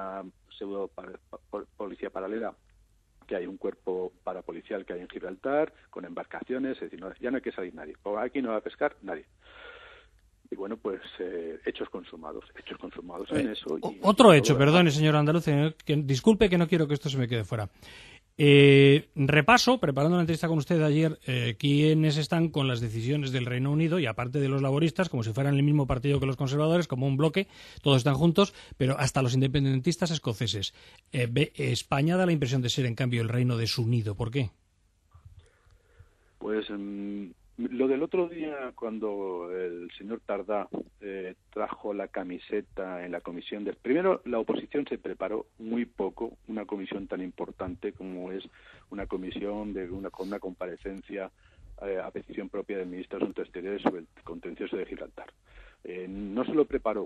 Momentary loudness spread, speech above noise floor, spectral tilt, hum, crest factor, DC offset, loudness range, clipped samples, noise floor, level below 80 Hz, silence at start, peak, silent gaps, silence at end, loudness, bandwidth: 17 LU; 40 dB; -6 dB/octave; none; 24 dB; under 0.1%; 15 LU; under 0.1%; -67 dBFS; -54 dBFS; 0 s; -4 dBFS; none; 0 s; -28 LUFS; 13 kHz